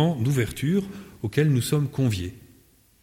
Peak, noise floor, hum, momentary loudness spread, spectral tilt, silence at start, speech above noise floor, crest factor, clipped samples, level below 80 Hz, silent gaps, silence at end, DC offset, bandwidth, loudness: -8 dBFS; -58 dBFS; none; 12 LU; -6.5 dB/octave; 0 s; 34 dB; 16 dB; under 0.1%; -52 dBFS; none; 0.65 s; under 0.1%; 16.5 kHz; -25 LUFS